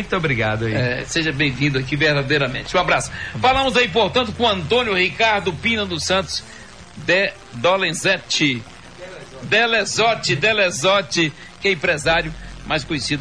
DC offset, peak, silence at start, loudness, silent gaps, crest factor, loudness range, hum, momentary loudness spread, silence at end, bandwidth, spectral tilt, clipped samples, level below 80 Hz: 0.3%; -6 dBFS; 0 s; -18 LUFS; none; 14 dB; 2 LU; none; 10 LU; 0 s; 11 kHz; -4 dB/octave; under 0.1%; -42 dBFS